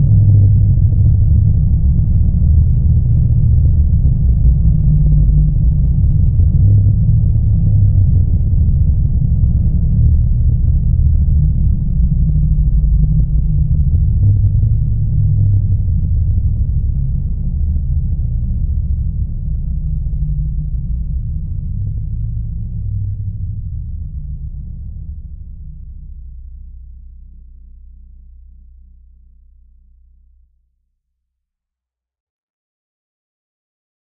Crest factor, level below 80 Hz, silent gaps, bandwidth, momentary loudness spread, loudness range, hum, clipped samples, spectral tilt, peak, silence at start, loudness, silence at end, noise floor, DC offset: 12 dB; -16 dBFS; 32.20-32.48 s; 0.9 kHz; 14 LU; 13 LU; none; under 0.1%; -17.5 dB/octave; -2 dBFS; 0 s; -15 LUFS; 1.55 s; -85 dBFS; 3%